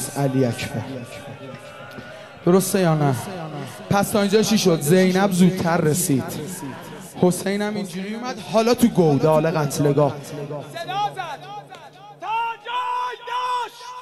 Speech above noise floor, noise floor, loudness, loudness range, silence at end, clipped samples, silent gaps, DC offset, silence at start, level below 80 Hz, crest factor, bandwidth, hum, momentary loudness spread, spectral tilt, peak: 22 dB; -42 dBFS; -21 LUFS; 7 LU; 0 s; under 0.1%; none; 0.1%; 0 s; -56 dBFS; 18 dB; 15 kHz; none; 19 LU; -5.5 dB/octave; -2 dBFS